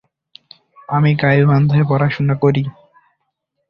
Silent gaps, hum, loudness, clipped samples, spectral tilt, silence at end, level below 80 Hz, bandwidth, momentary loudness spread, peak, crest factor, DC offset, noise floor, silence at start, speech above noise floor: none; none; -15 LUFS; under 0.1%; -10 dB/octave; 1 s; -50 dBFS; 5.6 kHz; 9 LU; -2 dBFS; 14 dB; under 0.1%; -72 dBFS; 0.9 s; 58 dB